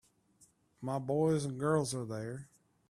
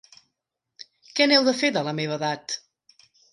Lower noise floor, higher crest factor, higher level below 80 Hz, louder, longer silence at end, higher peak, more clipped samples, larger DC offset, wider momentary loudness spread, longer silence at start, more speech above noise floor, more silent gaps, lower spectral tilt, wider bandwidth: second, -68 dBFS vs -82 dBFS; about the same, 20 dB vs 20 dB; first, -70 dBFS vs -76 dBFS; second, -35 LUFS vs -23 LUFS; second, 0.45 s vs 0.75 s; second, -16 dBFS vs -6 dBFS; neither; neither; about the same, 13 LU vs 14 LU; about the same, 0.8 s vs 0.8 s; second, 35 dB vs 59 dB; neither; first, -6.5 dB/octave vs -3.5 dB/octave; first, 14 kHz vs 11.5 kHz